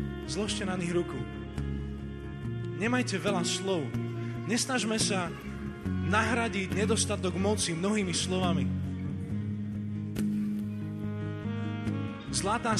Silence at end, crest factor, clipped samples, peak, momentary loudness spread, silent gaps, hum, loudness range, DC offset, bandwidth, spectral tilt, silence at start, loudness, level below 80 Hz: 0 s; 20 dB; under 0.1%; -12 dBFS; 9 LU; none; none; 5 LU; under 0.1%; 13.5 kHz; -4.5 dB/octave; 0 s; -31 LUFS; -48 dBFS